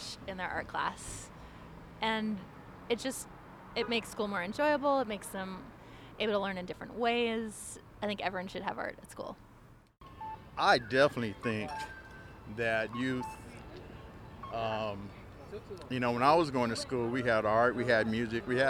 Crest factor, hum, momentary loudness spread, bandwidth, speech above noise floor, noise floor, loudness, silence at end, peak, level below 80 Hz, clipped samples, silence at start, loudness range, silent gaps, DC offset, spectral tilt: 22 dB; none; 21 LU; 17 kHz; 25 dB; -58 dBFS; -33 LUFS; 0 s; -12 dBFS; -58 dBFS; under 0.1%; 0 s; 7 LU; none; under 0.1%; -4.5 dB/octave